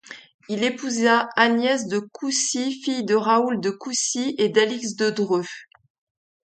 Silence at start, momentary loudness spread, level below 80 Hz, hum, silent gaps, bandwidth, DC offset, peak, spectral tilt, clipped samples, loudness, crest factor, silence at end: 0.1 s; 9 LU; -72 dBFS; none; 0.34-0.39 s; 9.4 kHz; under 0.1%; -4 dBFS; -3 dB/octave; under 0.1%; -22 LUFS; 20 dB; 0.85 s